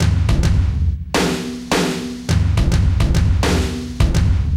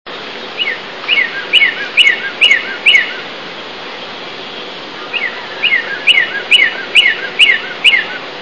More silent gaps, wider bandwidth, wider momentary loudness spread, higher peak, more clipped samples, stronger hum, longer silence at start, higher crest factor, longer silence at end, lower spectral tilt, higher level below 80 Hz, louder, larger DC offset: neither; first, 15.5 kHz vs 11 kHz; second, 5 LU vs 16 LU; second, -4 dBFS vs 0 dBFS; second, under 0.1% vs 0.6%; neither; about the same, 0 s vs 0.05 s; about the same, 12 dB vs 14 dB; about the same, 0 s vs 0 s; first, -5.5 dB/octave vs -0.5 dB/octave; first, -20 dBFS vs -64 dBFS; second, -18 LUFS vs -10 LUFS; second, under 0.1% vs 0.8%